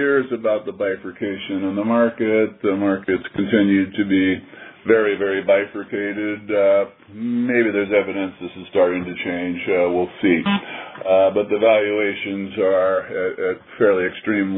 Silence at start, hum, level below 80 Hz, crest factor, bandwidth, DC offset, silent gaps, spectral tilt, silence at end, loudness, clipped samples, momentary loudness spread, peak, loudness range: 0 s; none; -60 dBFS; 18 dB; 4 kHz; under 0.1%; none; -10.5 dB/octave; 0 s; -20 LUFS; under 0.1%; 9 LU; -2 dBFS; 2 LU